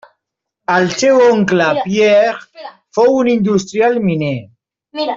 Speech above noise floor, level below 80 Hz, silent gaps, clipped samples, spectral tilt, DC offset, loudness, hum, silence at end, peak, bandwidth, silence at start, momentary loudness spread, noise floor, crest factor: 65 dB; -56 dBFS; none; under 0.1%; -5.5 dB/octave; under 0.1%; -13 LUFS; none; 0 s; -2 dBFS; 7.8 kHz; 0.7 s; 15 LU; -77 dBFS; 12 dB